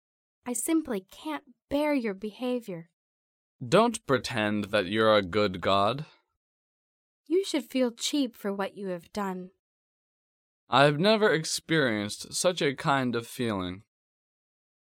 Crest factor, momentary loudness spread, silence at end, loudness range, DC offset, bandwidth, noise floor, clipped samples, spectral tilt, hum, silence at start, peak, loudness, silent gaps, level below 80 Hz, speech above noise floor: 24 dB; 14 LU; 1.15 s; 6 LU; under 0.1%; 17 kHz; under -90 dBFS; under 0.1%; -4.5 dB/octave; none; 0.45 s; -6 dBFS; -28 LUFS; 2.93-3.59 s, 6.37-7.24 s, 9.59-10.67 s; -64 dBFS; over 63 dB